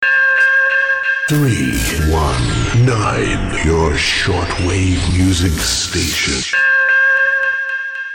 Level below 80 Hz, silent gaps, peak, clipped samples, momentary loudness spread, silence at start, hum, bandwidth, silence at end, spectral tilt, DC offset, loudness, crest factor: -26 dBFS; none; -6 dBFS; under 0.1%; 7 LU; 0 s; none; 19 kHz; 0 s; -4 dB/octave; under 0.1%; -14 LUFS; 8 dB